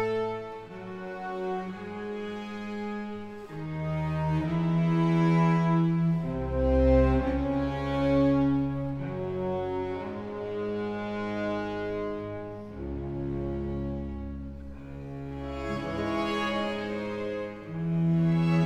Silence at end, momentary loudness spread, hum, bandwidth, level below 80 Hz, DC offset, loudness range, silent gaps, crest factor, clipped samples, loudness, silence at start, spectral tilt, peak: 0 s; 15 LU; none; 7.6 kHz; -40 dBFS; under 0.1%; 10 LU; none; 16 dB; under 0.1%; -29 LUFS; 0 s; -8.5 dB/octave; -12 dBFS